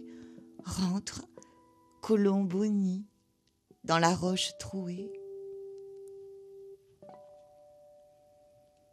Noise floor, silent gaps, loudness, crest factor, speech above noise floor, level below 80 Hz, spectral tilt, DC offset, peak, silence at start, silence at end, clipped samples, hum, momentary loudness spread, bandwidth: -73 dBFS; none; -31 LUFS; 24 dB; 43 dB; -64 dBFS; -5 dB/octave; under 0.1%; -10 dBFS; 0 s; 1.55 s; under 0.1%; none; 25 LU; 13.5 kHz